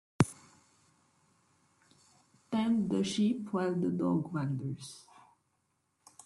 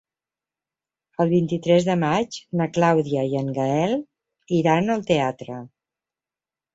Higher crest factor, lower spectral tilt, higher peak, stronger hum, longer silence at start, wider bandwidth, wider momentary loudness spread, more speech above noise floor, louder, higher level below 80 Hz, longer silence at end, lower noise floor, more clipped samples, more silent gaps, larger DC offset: first, 28 dB vs 18 dB; about the same, -6.5 dB/octave vs -6.5 dB/octave; about the same, -8 dBFS vs -6 dBFS; neither; second, 0.2 s vs 1.2 s; first, 12 kHz vs 8 kHz; first, 14 LU vs 9 LU; second, 46 dB vs over 69 dB; second, -33 LUFS vs -22 LUFS; about the same, -66 dBFS vs -62 dBFS; first, 1.25 s vs 1.1 s; second, -78 dBFS vs under -90 dBFS; neither; neither; neither